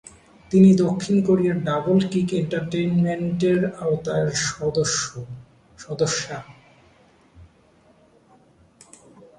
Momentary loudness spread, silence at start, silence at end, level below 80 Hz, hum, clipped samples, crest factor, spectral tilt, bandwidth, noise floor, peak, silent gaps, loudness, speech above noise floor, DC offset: 15 LU; 0.5 s; 1.95 s; -56 dBFS; none; under 0.1%; 18 dB; -5.5 dB/octave; 10.5 kHz; -56 dBFS; -4 dBFS; none; -21 LUFS; 36 dB; under 0.1%